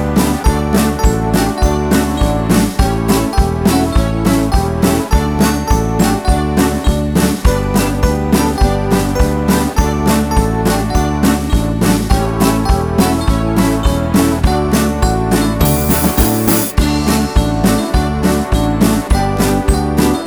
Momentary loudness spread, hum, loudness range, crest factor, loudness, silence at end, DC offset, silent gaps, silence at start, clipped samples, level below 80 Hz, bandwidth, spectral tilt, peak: 2 LU; none; 1 LU; 12 dB; -14 LUFS; 0 s; under 0.1%; none; 0 s; under 0.1%; -18 dBFS; over 20 kHz; -5.5 dB/octave; 0 dBFS